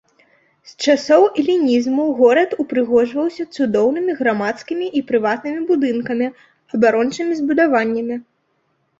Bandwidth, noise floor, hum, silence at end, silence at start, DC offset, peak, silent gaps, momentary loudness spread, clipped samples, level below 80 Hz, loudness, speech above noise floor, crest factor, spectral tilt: 7.8 kHz; -66 dBFS; none; 0.8 s; 0.65 s; under 0.1%; -2 dBFS; none; 9 LU; under 0.1%; -62 dBFS; -17 LUFS; 49 dB; 16 dB; -5 dB/octave